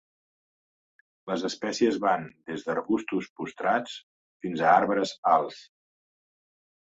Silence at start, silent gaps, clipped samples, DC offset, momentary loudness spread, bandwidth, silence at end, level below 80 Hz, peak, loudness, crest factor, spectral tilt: 1.25 s; 3.30-3.36 s, 4.03-4.40 s, 5.18-5.23 s; under 0.1%; under 0.1%; 16 LU; 8 kHz; 1.3 s; -70 dBFS; -8 dBFS; -27 LUFS; 22 dB; -5 dB/octave